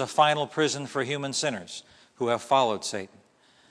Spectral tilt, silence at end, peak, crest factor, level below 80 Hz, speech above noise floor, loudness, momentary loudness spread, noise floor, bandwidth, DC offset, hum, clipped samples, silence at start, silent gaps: -3.5 dB/octave; 0.65 s; -6 dBFS; 22 dB; -76 dBFS; 34 dB; -27 LUFS; 15 LU; -60 dBFS; 11 kHz; under 0.1%; none; under 0.1%; 0 s; none